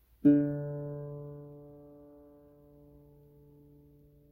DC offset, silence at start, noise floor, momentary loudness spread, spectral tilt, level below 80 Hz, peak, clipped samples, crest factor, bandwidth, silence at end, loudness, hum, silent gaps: under 0.1%; 0.25 s; -60 dBFS; 28 LU; -12 dB/octave; -64 dBFS; -12 dBFS; under 0.1%; 22 dB; 2.6 kHz; 2.3 s; -31 LUFS; none; none